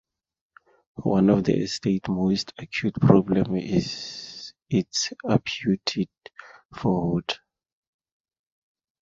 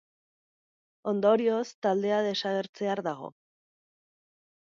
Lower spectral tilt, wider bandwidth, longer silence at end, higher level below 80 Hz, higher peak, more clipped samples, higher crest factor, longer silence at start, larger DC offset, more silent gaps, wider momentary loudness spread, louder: about the same, -6 dB/octave vs -5.5 dB/octave; about the same, 7.8 kHz vs 7.6 kHz; first, 1.65 s vs 1.4 s; first, -52 dBFS vs -82 dBFS; first, -2 dBFS vs -12 dBFS; neither; about the same, 24 dB vs 20 dB; about the same, 1 s vs 1.05 s; neither; second, 6.65-6.69 s vs 1.75-1.82 s, 2.69-2.73 s; about the same, 15 LU vs 13 LU; first, -24 LUFS vs -28 LUFS